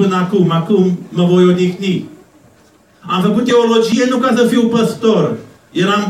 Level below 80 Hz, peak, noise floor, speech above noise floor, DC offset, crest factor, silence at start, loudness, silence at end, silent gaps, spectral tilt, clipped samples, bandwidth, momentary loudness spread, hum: -58 dBFS; 0 dBFS; -48 dBFS; 36 dB; under 0.1%; 12 dB; 0 s; -13 LUFS; 0 s; none; -6.5 dB/octave; under 0.1%; 13.5 kHz; 8 LU; none